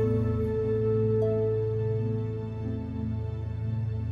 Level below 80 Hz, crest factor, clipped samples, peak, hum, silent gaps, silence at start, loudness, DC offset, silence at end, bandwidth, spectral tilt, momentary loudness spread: -44 dBFS; 12 dB; under 0.1%; -16 dBFS; none; none; 0 s; -29 LUFS; under 0.1%; 0 s; 4.7 kHz; -11 dB/octave; 8 LU